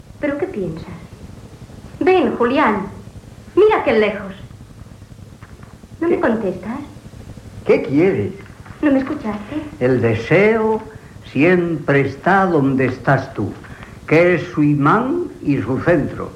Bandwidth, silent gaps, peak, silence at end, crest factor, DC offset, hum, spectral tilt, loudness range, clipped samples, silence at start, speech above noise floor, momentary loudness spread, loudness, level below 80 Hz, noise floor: 11.5 kHz; none; -2 dBFS; 0 s; 16 dB; under 0.1%; none; -8 dB/octave; 5 LU; under 0.1%; 0.15 s; 23 dB; 23 LU; -17 LUFS; -46 dBFS; -39 dBFS